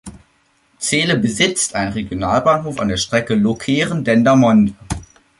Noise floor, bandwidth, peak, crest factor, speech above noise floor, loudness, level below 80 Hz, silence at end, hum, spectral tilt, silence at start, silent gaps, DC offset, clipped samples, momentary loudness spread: -59 dBFS; 11.5 kHz; 0 dBFS; 16 dB; 43 dB; -16 LUFS; -42 dBFS; 0.35 s; none; -4.5 dB/octave; 0.05 s; none; under 0.1%; under 0.1%; 10 LU